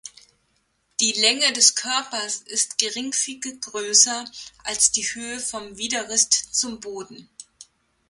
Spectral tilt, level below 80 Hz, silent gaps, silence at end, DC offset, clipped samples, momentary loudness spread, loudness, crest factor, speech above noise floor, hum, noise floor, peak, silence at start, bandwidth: 1 dB/octave; -64 dBFS; none; 0.45 s; under 0.1%; under 0.1%; 17 LU; -20 LUFS; 24 dB; 45 dB; none; -68 dBFS; 0 dBFS; 0.05 s; 12 kHz